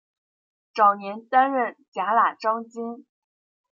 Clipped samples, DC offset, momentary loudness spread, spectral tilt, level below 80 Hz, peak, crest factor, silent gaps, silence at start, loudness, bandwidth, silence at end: under 0.1%; under 0.1%; 15 LU; -5.5 dB/octave; -86 dBFS; -6 dBFS; 20 dB; 1.88-1.92 s; 0.75 s; -22 LUFS; 7.4 kHz; 0.7 s